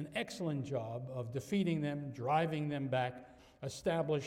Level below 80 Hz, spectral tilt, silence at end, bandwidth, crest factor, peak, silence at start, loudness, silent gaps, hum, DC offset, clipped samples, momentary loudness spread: -68 dBFS; -6.5 dB/octave; 0 s; 15 kHz; 16 dB; -20 dBFS; 0 s; -37 LUFS; none; none; under 0.1%; under 0.1%; 8 LU